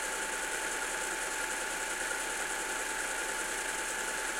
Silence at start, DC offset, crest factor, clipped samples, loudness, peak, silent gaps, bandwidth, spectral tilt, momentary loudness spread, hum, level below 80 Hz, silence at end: 0 s; under 0.1%; 14 dB; under 0.1%; -33 LUFS; -22 dBFS; none; 16.5 kHz; 0.5 dB/octave; 0 LU; none; -58 dBFS; 0 s